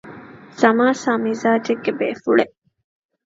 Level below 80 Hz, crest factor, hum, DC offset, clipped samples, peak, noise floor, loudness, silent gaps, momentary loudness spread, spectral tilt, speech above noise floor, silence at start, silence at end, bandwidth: -66 dBFS; 20 dB; none; under 0.1%; under 0.1%; 0 dBFS; -40 dBFS; -19 LUFS; none; 10 LU; -5 dB/octave; 22 dB; 0.05 s; 0.8 s; 7.8 kHz